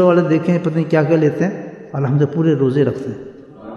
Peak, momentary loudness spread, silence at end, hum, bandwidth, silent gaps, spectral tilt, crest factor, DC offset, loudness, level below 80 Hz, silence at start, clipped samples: -2 dBFS; 15 LU; 0 s; none; 7.2 kHz; none; -9 dB/octave; 14 dB; under 0.1%; -16 LUFS; -58 dBFS; 0 s; under 0.1%